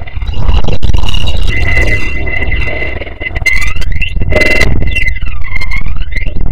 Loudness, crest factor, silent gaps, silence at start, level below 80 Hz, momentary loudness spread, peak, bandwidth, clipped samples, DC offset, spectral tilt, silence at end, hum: -14 LUFS; 12 dB; none; 0 s; -14 dBFS; 9 LU; 0 dBFS; 12.5 kHz; 10%; 40%; -5 dB/octave; 0 s; none